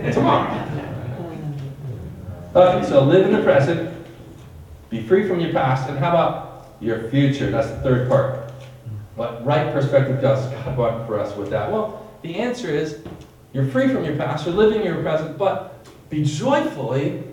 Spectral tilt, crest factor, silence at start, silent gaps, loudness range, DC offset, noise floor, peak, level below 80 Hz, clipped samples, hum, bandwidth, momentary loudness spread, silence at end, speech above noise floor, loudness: -7.5 dB/octave; 18 dB; 0 s; none; 5 LU; under 0.1%; -40 dBFS; -2 dBFS; -48 dBFS; under 0.1%; none; 11 kHz; 18 LU; 0 s; 21 dB; -20 LUFS